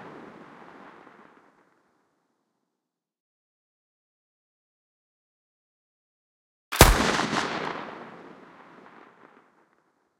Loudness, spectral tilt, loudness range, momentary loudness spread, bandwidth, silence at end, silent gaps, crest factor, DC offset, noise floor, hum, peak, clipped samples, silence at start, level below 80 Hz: -22 LUFS; -3.5 dB/octave; 4 LU; 30 LU; 16 kHz; 2 s; 3.20-6.71 s; 30 dB; under 0.1%; -85 dBFS; none; 0 dBFS; under 0.1%; 0 s; -36 dBFS